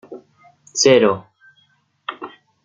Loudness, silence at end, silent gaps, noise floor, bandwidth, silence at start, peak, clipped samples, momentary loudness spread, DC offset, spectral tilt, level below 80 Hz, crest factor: -16 LUFS; 0.35 s; none; -61 dBFS; 9.4 kHz; 0.1 s; -2 dBFS; under 0.1%; 22 LU; under 0.1%; -3 dB/octave; -62 dBFS; 20 dB